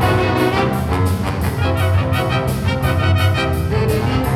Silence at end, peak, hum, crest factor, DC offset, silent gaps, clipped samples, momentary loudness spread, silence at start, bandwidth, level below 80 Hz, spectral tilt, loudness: 0 s; -2 dBFS; none; 14 dB; under 0.1%; none; under 0.1%; 3 LU; 0 s; 15.5 kHz; -28 dBFS; -6.5 dB/octave; -17 LUFS